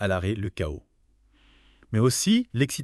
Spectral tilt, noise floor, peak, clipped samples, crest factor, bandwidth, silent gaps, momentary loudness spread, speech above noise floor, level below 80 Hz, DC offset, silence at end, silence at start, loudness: -5 dB/octave; -62 dBFS; -8 dBFS; under 0.1%; 18 dB; 13.5 kHz; none; 11 LU; 38 dB; -46 dBFS; under 0.1%; 0 s; 0 s; -25 LUFS